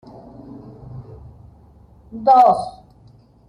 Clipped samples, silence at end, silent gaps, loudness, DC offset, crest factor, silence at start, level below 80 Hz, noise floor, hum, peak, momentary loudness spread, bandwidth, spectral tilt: under 0.1%; 0.8 s; none; -15 LUFS; under 0.1%; 18 dB; 0.9 s; -50 dBFS; -49 dBFS; none; -4 dBFS; 27 LU; 10 kHz; -7 dB/octave